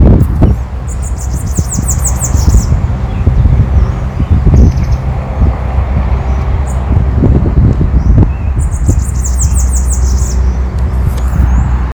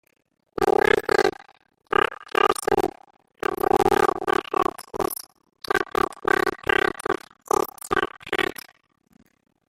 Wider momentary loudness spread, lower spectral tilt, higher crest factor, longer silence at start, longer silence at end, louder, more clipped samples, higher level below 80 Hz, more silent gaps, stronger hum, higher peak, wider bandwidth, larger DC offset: second, 6 LU vs 10 LU; first, -6.5 dB/octave vs -3.5 dB/octave; second, 8 dB vs 20 dB; second, 0 s vs 0.6 s; second, 0 s vs 1.15 s; first, -12 LUFS vs -23 LUFS; first, 1% vs under 0.1%; first, -12 dBFS vs -50 dBFS; neither; neither; first, 0 dBFS vs -4 dBFS; first, over 20 kHz vs 16.5 kHz; neither